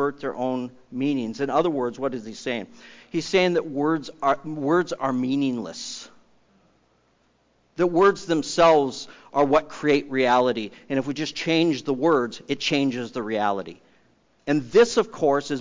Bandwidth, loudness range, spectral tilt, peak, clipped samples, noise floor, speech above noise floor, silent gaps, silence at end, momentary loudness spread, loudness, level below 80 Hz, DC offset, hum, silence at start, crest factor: 7.6 kHz; 6 LU; -5 dB/octave; -8 dBFS; under 0.1%; -64 dBFS; 41 dB; none; 0 s; 13 LU; -23 LUFS; -62 dBFS; under 0.1%; none; 0 s; 16 dB